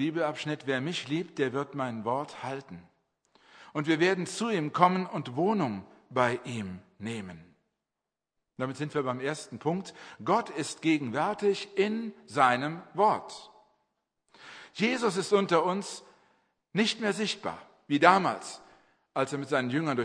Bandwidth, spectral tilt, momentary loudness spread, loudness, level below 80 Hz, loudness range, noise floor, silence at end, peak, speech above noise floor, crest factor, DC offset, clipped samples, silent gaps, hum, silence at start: 10.5 kHz; -5 dB/octave; 16 LU; -29 LUFS; -76 dBFS; 6 LU; -89 dBFS; 0 s; -4 dBFS; 60 dB; 26 dB; under 0.1%; under 0.1%; none; none; 0 s